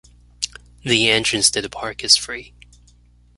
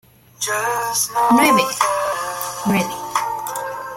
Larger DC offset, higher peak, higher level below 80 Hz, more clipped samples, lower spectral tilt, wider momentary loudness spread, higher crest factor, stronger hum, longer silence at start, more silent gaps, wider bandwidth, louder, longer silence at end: neither; about the same, 0 dBFS vs -2 dBFS; first, -48 dBFS vs -58 dBFS; neither; second, -1.5 dB/octave vs -3 dB/octave; first, 15 LU vs 11 LU; about the same, 22 dB vs 18 dB; first, 60 Hz at -45 dBFS vs none; about the same, 0.4 s vs 0.4 s; neither; second, 12 kHz vs 16.5 kHz; about the same, -17 LUFS vs -19 LUFS; first, 0.9 s vs 0 s